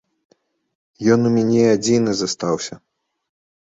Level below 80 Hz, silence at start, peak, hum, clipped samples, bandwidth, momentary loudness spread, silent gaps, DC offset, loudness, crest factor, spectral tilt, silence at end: -58 dBFS; 1 s; -2 dBFS; none; under 0.1%; 8 kHz; 8 LU; none; under 0.1%; -18 LUFS; 18 dB; -5.5 dB/octave; 0.95 s